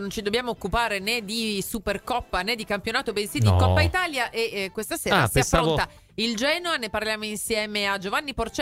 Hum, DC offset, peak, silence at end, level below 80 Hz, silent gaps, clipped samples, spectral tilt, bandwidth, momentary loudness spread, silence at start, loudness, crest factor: none; under 0.1%; -4 dBFS; 0 s; -42 dBFS; none; under 0.1%; -4 dB/octave; 16 kHz; 8 LU; 0 s; -24 LUFS; 20 dB